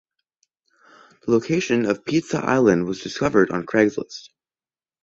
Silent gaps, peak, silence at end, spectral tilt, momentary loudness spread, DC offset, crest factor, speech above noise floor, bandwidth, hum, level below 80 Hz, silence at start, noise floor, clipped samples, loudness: none; -4 dBFS; 0.85 s; -6 dB/octave; 13 LU; under 0.1%; 18 dB; over 70 dB; 8 kHz; none; -56 dBFS; 1.25 s; under -90 dBFS; under 0.1%; -21 LUFS